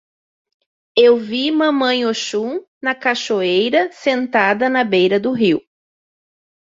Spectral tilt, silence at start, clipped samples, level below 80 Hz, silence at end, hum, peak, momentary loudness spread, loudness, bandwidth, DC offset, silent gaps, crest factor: -4.5 dB/octave; 0.95 s; under 0.1%; -64 dBFS; 1.15 s; none; 0 dBFS; 8 LU; -16 LUFS; 7.8 kHz; under 0.1%; 2.68-2.81 s; 18 dB